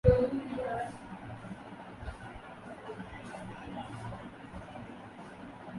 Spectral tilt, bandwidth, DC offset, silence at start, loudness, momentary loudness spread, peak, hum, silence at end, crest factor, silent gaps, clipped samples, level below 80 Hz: -8 dB/octave; 11.5 kHz; under 0.1%; 0.05 s; -39 LUFS; 12 LU; -8 dBFS; none; 0 s; 28 dB; none; under 0.1%; -46 dBFS